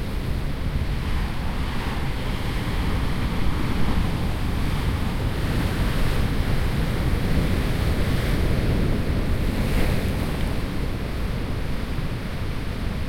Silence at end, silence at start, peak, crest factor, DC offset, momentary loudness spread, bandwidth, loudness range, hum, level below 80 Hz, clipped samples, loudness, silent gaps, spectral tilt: 0 s; 0 s; -8 dBFS; 14 dB; under 0.1%; 5 LU; 16.5 kHz; 3 LU; none; -26 dBFS; under 0.1%; -26 LUFS; none; -6.5 dB/octave